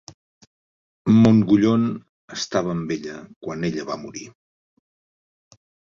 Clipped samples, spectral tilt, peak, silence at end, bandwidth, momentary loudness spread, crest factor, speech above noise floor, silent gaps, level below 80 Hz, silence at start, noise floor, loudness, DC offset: under 0.1%; -6.5 dB/octave; -4 dBFS; 1.65 s; 7.4 kHz; 21 LU; 18 dB; over 70 dB; 2.09-2.28 s, 3.36-3.41 s; -54 dBFS; 1.05 s; under -90 dBFS; -20 LUFS; under 0.1%